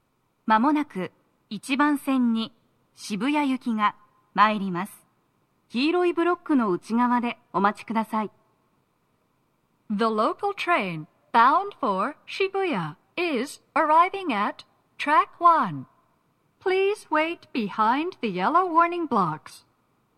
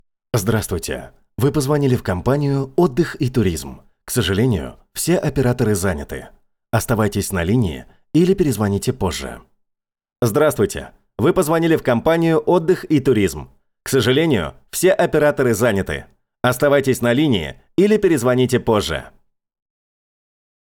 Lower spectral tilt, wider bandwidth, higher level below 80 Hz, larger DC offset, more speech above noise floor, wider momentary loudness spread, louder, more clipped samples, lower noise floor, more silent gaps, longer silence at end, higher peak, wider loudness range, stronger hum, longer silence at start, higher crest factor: about the same, -5.5 dB/octave vs -5.5 dB/octave; second, 14 kHz vs over 20 kHz; second, -76 dBFS vs -42 dBFS; neither; second, 46 dB vs 60 dB; about the same, 13 LU vs 11 LU; second, -24 LUFS vs -18 LUFS; neither; second, -69 dBFS vs -78 dBFS; neither; second, 0.6 s vs 1.6 s; about the same, -4 dBFS vs -4 dBFS; about the same, 4 LU vs 3 LU; neither; about the same, 0.45 s vs 0.35 s; first, 20 dB vs 14 dB